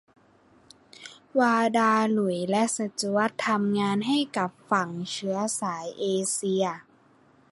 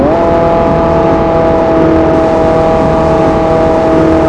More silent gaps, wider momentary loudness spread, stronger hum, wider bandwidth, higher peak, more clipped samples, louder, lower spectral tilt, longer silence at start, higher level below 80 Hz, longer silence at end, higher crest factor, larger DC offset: neither; first, 9 LU vs 1 LU; neither; first, 11.5 kHz vs 10 kHz; second, -8 dBFS vs 0 dBFS; second, under 0.1% vs 1%; second, -26 LUFS vs -9 LUFS; second, -4 dB/octave vs -8 dB/octave; first, 1 s vs 0 s; second, -72 dBFS vs -24 dBFS; first, 0.7 s vs 0 s; first, 18 dB vs 8 dB; neither